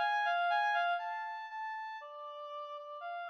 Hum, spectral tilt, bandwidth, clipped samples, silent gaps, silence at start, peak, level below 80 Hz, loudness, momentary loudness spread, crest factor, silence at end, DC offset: none; 2.5 dB/octave; 7 kHz; under 0.1%; none; 0 s; -24 dBFS; under -90 dBFS; -36 LUFS; 14 LU; 14 dB; 0 s; under 0.1%